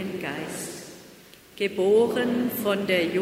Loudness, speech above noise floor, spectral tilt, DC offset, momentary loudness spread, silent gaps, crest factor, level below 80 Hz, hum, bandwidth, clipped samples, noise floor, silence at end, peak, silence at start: -25 LUFS; 27 dB; -4.5 dB/octave; under 0.1%; 17 LU; none; 16 dB; -66 dBFS; none; 16 kHz; under 0.1%; -50 dBFS; 0 s; -10 dBFS; 0 s